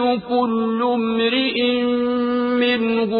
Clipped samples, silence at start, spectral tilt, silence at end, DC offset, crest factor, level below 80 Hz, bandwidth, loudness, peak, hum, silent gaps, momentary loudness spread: under 0.1%; 0 s; -10 dB/octave; 0 s; under 0.1%; 10 dB; -58 dBFS; 5 kHz; -19 LUFS; -8 dBFS; none; none; 2 LU